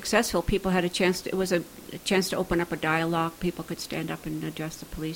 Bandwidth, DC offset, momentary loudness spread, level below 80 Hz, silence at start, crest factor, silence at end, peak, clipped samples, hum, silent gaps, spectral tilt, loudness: 17 kHz; under 0.1%; 10 LU; -46 dBFS; 0 s; 18 dB; 0 s; -8 dBFS; under 0.1%; none; none; -4.5 dB/octave; -28 LUFS